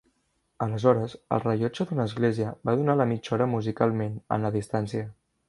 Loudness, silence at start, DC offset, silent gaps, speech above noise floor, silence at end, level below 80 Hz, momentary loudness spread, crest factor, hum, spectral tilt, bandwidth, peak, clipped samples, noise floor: -27 LUFS; 0.6 s; under 0.1%; none; 47 dB; 0.35 s; -60 dBFS; 8 LU; 22 dB; none; -8 dB/octave; 11.5 kHz; -6 dBFS; under 0.1%; -73 dBFS